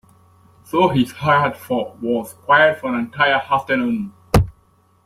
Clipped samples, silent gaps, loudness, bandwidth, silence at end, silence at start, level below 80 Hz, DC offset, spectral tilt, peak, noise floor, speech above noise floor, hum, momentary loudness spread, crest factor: under 0.1%; none; -18 LUFS; 16 kHz; 0.55 s; 0.75 s; -36 dBFS; under 0.1%; -6 dB/octave; 0 dBFS; -57 dBFS; 39 dB; none; 10 LU; 18 dB